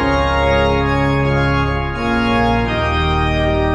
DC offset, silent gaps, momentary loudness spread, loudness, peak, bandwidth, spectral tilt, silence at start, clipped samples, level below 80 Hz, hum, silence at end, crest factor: under 0.1%; none; 3 LU; -16 LUFS; -2 dBFS; 10.5 kHz; -7 dB/octave; 0 s; under 0.1%; -24 dBFS; none; 0 s; 14 dB